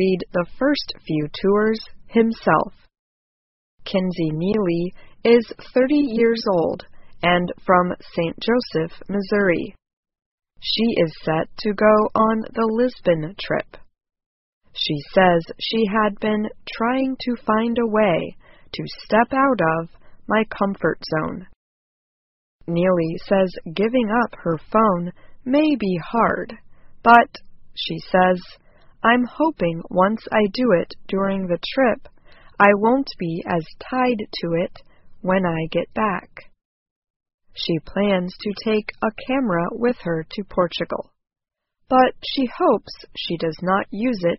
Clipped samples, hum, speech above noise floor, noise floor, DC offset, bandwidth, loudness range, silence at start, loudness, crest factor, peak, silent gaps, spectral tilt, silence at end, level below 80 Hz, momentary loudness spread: under 0.1%; none; over 70 dB; under -90 dBFS; under 0.1%; 6 kHz; 4 LU; 0 s; -21 LUFS; 20 dB; 0 dBFS; 2.99-3.78 s, 9.93-10.03 s, 10.26-10.38 s, 14.26-14.61 s, 21.56-22.59 s, 36.65-37.02 s, 37.10-37.20 s, 37.34-37.38 s; -4 dB/octave; 0 s; -48 dBFS; 10 LU